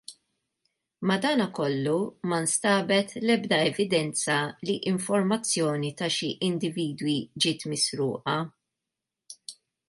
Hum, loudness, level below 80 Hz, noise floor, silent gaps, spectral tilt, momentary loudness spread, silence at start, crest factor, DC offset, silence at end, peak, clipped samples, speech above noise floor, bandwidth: none; -26 LUFS; -72 dBFS; -87 dBFS; none; -4 dB/octave; 6 LU; 0.1 s; 18 dB; under 0.1%; 0.35 s; -10 dBFS; under 0.1%; 61 dB; 11.5 kHz